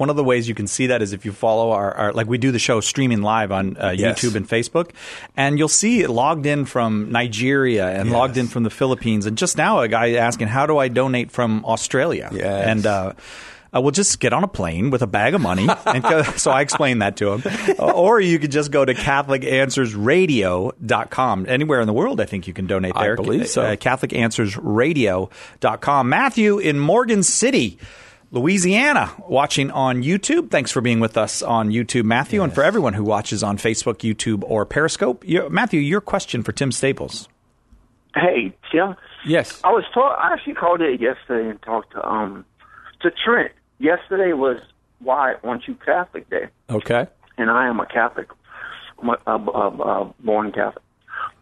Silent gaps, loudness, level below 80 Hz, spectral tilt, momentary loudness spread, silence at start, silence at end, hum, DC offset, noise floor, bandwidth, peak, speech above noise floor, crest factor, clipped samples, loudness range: none; -19 LUFS; -50 dBFS; -4.5 dB/octave; 8 LU; 0 s; 0.1 s; none; under 0.1%; -54 dBFS; 12.5 kHz; -2 dBFS; 35 dB; 16 dB; under 0.1%; 5 LU